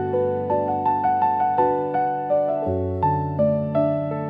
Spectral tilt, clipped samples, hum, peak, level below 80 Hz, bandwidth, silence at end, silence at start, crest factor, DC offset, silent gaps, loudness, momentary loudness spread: -11 dB/octave; under 0.1%; none; -8 dBFS; -58 dBFS; 4.9 kHz; 0 s; 0 s; 12 dB; under 0.1%; none; -22 LUFS; 3 LU